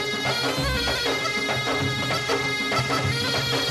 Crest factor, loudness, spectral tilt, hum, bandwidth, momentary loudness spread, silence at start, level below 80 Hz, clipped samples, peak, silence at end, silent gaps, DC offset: 12 dB; -23 LUFS; -3.5 dB/octave; none; 14 kHz; 1 LU; 0 s; -42 dBFS; under 0.1%; -12 dBFS; 0 s; none; under 0.1%